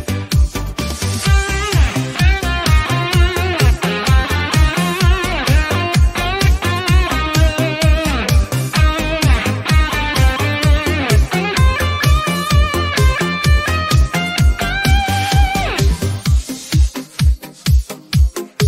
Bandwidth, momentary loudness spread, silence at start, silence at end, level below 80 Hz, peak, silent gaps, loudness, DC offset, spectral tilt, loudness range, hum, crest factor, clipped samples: 16 kHz; 3 LU; 0 s; 0 s; -18 dBFS; -2 dBFS; none; -15 LUFS; under 0.1%; -5 dB/octave; 1 LU; none; 12 dB; under 0.1%